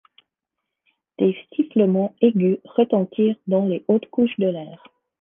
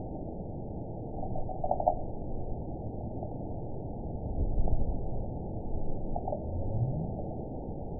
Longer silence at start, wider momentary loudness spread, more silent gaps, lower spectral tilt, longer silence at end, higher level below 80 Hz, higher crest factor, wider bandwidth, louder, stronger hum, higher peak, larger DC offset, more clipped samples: first, 1.2 s vs 0 s; about the same, 5 LU vs 7 LU; neither; second, -11 dB/octave vs -16 dB/octave; first, 0.45 s vs 0 s; second, -70 dBFS vs -36 dBFS; about the same, 18 dB vs 22 dB; first, 3.7 kHz vs 1 kHz; first, -21 LUFS vs -37 LUFS; neither; first, -4 dBFS vs -10 dBFS; second, under 0.1% vs 0.4%; neither